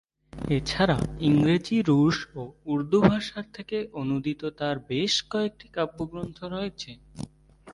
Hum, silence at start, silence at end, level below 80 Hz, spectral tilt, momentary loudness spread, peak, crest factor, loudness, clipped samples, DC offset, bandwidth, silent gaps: none; 0.35 s; 0 s; -48 dBFS; -6 dB/octave; 17 LU; -4 dBFS; 22 dB; -26 LUFS; under 0.1%; under 0.1%; 11.5 kHz; none